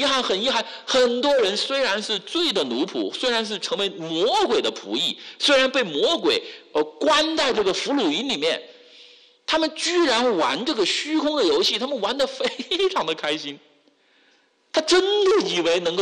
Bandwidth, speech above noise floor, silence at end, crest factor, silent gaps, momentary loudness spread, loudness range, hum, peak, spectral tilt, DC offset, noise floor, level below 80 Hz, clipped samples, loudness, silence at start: 12 kHz; 39 dB; 0 s; 12 dB; none; 7 LU; 2 LU; none; -10 dBFS; -2.5 dB/octave; under 0.1%; -61 dBFS; -62 dBFS; under 0.1%; -21 LUFS; 0 s